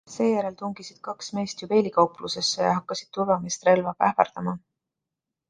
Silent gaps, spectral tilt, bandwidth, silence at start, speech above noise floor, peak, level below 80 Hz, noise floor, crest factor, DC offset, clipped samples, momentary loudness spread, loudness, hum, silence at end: none; -4.5 dB/octave; 10 kHz; 0.1 s; 61 dB; -2 dBFS; -66 dBFS; -86 dBFS; 24 dB; under 0.1%; under 0.1%; 13 LU; -25 LUFS; none; 0.9 s